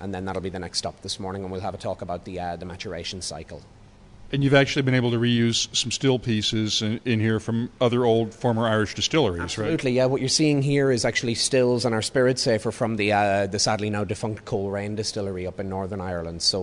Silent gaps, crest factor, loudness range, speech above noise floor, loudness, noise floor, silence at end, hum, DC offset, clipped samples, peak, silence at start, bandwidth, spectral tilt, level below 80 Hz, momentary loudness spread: none; 20 dB; 9 LU; 22 dB; -24 LUFS; -46 dBFS; 0 s; none; under 0.1%; under 0.1%; -4 dBFS; 0 s; 11 kHz; -4.5 dB/octave; -52 dBFS; 11 LU